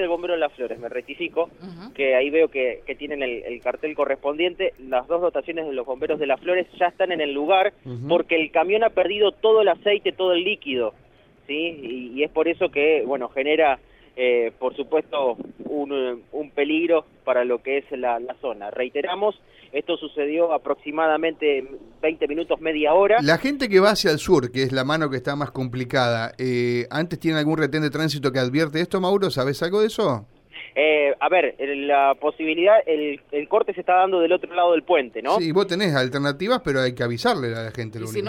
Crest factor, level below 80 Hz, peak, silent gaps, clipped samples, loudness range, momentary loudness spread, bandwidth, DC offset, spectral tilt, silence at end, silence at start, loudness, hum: 18 dB; -56 dBFS; -4 dBFS; none; under 0.1%; 5 LU; 10 LU; 16 kHz; under 0.1%; -5.5 dB/octave; 0 s; 0 s; -22 LUFS; none